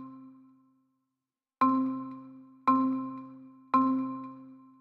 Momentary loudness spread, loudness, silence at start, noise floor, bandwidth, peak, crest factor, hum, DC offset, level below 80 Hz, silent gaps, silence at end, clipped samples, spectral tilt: 22 LU; -29 LUFS; 0 s; -89 dBFS; 5 kHz; -12 dBFS; 20 dB; none; under 0.1%; -82 dBFS; none; 0.25 s; under 0.1%; -8.5 dB/octave